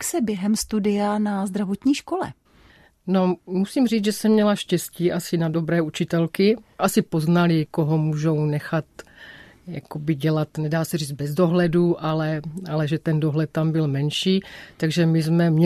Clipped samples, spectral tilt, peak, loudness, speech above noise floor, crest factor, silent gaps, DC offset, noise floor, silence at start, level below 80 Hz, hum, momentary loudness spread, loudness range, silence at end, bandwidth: under 0.1%; -6 dB/octave; -6 dBFS; -22 LUFS; 32 dB; 16 dB; none; under 0.1%; -54 dBFS; 0 s; -56 dBFS; none; 9 LU; 3 LU; 0 s; 14 kHz